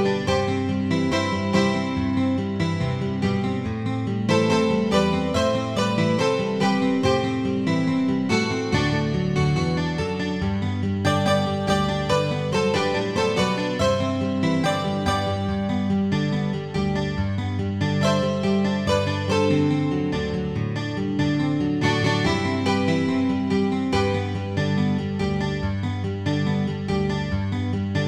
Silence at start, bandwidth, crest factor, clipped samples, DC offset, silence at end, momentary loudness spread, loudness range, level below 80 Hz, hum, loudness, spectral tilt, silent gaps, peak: 0 s; 12 kHz; 16 dB; under 0.1%; 0.2%; 0 s; 5 LU; 2 LU; -44 dBFS; none; -23 LUFS; -6 dB/octave; none; -6 dBFS